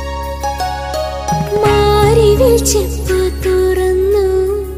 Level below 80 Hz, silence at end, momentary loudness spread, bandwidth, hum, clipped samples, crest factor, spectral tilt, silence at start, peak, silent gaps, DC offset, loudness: -22 dBFS; 0 s; 10 LU; 16 kHz; none; under 0.1%; 12 dB; -5 dB/octave; 0 s; 0 dBFS; none; 0.3%; -13 LUFS